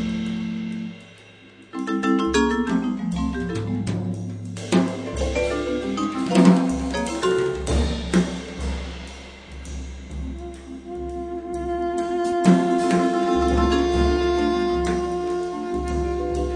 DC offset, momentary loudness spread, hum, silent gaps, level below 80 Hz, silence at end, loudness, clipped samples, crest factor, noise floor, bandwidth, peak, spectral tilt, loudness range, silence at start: under 0.1%; 15 LU; none; none; -34 dBFS; 0 s; -23 LUFS; under 0.1%; 20 dB; -47 dBFS; 10 kHz; -2 dBFS; -6 dB/octave; 9 LU; 0 s